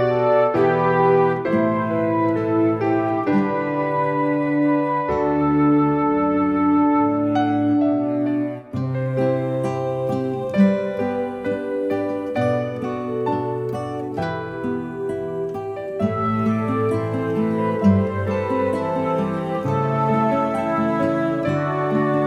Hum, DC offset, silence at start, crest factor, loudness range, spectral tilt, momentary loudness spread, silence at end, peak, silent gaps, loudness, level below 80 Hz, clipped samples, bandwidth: none; under 0.1%; 0 s; 16 dB; 6 LU; -9 dB/octave; 9 LU; 0 s; -4 dBFS; none; -21 LUFS; -54 dBFS; under 0.1%; 9.4 kHz